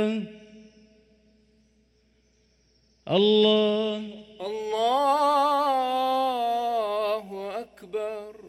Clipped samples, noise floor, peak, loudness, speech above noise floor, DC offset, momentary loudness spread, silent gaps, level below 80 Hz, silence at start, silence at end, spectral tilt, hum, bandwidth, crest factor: under 0.1%; -65 dBFS; -10 dBFS; -25 LUFS; 42 dB; under 0.1%; 15 LU; none; -68 dBFS; 0 s; 0 s; -5.5 dB/octave; none; 14.5 kHz; 18 dB